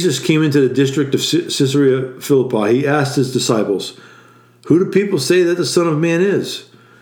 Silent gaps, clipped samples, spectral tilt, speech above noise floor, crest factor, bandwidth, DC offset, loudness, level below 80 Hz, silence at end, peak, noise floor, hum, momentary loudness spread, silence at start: none; under 0.1%; -5 dB/octave; 31 dB; 14 dB; 19 kHz; under 0.1%; -15 LUFS; -64 dBFS; 0.4 s; 0 dBFS; -46 dBFS; none; 6 LU; 0 s